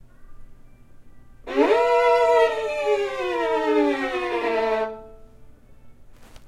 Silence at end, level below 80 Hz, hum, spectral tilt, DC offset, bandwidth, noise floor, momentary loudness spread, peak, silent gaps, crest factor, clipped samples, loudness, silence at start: 0 s; -50 dBFS; none; -4 dB/octave; under 0.1%; 12.5 kHz; -46 dBFS; 8 LU; -6 dBFS; none; 18 dB; under 0.1%; -21 LUFS; 0.2 s